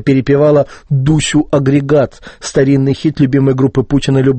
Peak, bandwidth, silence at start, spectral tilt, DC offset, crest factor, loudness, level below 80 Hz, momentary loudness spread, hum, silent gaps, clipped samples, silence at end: 0 dBFS; 8.8 kHz; 0 s; -6.5 dB/octave; under 0.1%; 12 dB; -12 LUFS; -34 dBFS; 5 LU; none; none; under 0.1%; 0 s